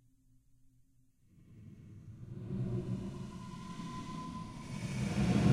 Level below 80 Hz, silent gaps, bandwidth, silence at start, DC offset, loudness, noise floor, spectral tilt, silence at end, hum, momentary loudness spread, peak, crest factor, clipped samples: -54 dBFS; none; 12.5 kHz; 1.35 s; under 0.1%; -39 LUFS; -68 dBFS; -7 dB/octave; 0 s; none; 20 LU; -16 dBFS; 22 dB; under 0.1%